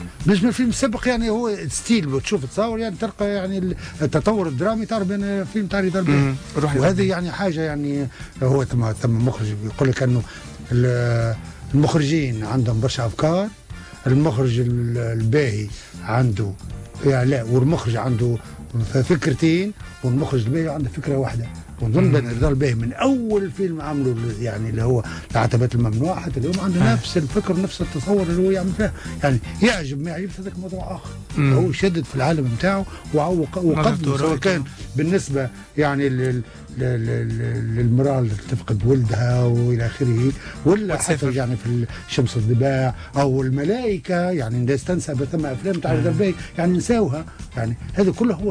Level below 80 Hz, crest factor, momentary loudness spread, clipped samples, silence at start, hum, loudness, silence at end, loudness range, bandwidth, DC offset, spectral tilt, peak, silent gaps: -40 dBFS; 12 dB; 8 LU; under 0.1%; 0 s; none; -21 LUFS; 0 s; 2 LU; 10.5 kHz; under 0.1%; -6.5 dB/octave; -8 dBFS; none